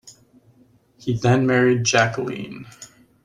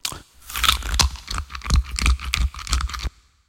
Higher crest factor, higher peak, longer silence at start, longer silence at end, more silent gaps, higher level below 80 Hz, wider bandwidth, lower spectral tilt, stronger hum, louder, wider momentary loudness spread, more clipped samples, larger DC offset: about the same, 20 dB vs 22 dB; about the same, -2 dBFS vs 0 dBFS; about the same, 0.05 s vs 0.05 s; about the same, 0.4 s vs 0.4 s; neither; second, -54 dBFS vs -26 dBFS; second, 10.5 kHz vs 17 kHz; first, -5 dB/octave vs -2 dB/octave; neither; first, -19 LUFS vs -23 LUFS; first, 19 LU vs 12 LU; neither; neither